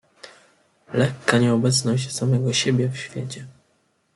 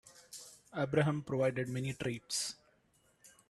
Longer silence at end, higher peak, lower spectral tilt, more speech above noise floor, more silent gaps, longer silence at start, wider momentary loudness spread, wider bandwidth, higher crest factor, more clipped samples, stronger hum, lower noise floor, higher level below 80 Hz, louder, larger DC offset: first, 0.65 s vs 0.2 s; first, -2 dBFS vs -16 dBFS; about the same, -5 dB/octave vs -5 dB/octave; first, 45 dB vs 37 dB; neither; first, 0.25 s vs 0.05 s; second, 13 LU vs 18 LU; about the same, 12 kHz vs 13 kHz; about the same, 20 dB vs 20 dB; neither; neither; second, -66 dBFS vs -72 dBFS; first, -60 dBFS vs -70 dBFS; first, -21 LUFS vs -36 LUFS; neither